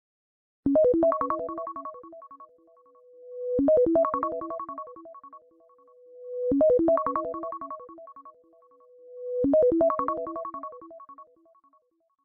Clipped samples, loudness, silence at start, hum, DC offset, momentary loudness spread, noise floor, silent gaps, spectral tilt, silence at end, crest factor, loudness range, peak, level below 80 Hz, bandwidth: under 0.1%; -26 LUFS; 0.65 s; none; under 0.1%; 25 LU; -68 dBFS; none; -11.5 dB/octave; 1 s; 18 dB; 1 LU; -12 dBFS; -58 dBFS; 2.7 kHz